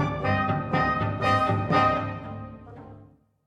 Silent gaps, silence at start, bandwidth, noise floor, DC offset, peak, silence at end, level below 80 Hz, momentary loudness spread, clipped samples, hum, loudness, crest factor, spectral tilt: none; 0 s; 10 kHz; -53 dBFS; under 0.1%; -10 dBFS; 0.4 s; -46 dBFS; 21 LU; under 0.1%; none; -24 LUFS; 16 dB; -7 dB/octave